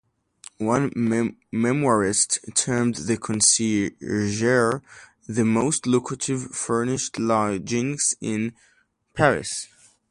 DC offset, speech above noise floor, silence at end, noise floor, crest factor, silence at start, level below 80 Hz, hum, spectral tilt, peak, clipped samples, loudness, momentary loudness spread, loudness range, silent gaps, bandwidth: under 0.1%; 26 dB; 0.45 s; -49 dBFS; 20 dB; 0.6 s; -56 dBFS; none; -4 dB/octave; -2 dBFS; under 0.1%; -23 LUFS; 8 LU; 3 LU; none; 11.5 kHz